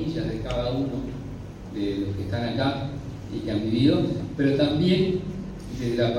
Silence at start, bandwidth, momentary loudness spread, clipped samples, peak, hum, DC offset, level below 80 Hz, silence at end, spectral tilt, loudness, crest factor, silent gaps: 0 s; 12 kHz; 14 LU; under 0.1%; -8 dBFS; none; under 0.1%; -42 dBFS; 0 s; -7.5 dB/octave; -26 LUFS; 18 dB; none